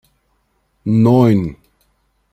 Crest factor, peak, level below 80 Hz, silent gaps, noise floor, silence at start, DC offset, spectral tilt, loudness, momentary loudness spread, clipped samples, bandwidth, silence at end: 14 dB; -2 dBFS; -48 dBFS; none; -63 dBFS; 0.85 s; under 0.1%; -9.5 dB/octave; -13 LUFS; 16 LU; under 0.1%; 13 kHz; 0.8 s